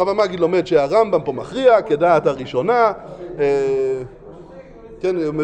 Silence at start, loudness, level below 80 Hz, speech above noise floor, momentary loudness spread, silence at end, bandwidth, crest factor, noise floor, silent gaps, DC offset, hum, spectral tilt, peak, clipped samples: 0 s; -18 LUFS; -50 dBFS; 22 dB; 10 LU; 0 s; 8.8 kHz; 16 dB; -39 dBFS; none; under 0.1%; none; -6.5 dB/octave; -2 dBFS; under 0.1%